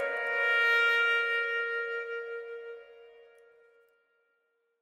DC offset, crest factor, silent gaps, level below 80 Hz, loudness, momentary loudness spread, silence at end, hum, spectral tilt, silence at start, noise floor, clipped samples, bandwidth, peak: under 0.1%; 18 dB; none; -84 dBFS; -27 LUFS; 19 LU; 1.7 s; none; 1 dB/octave; 0 s; -76 dBFS; under 0.1%; 16 kHz; -14 dBFS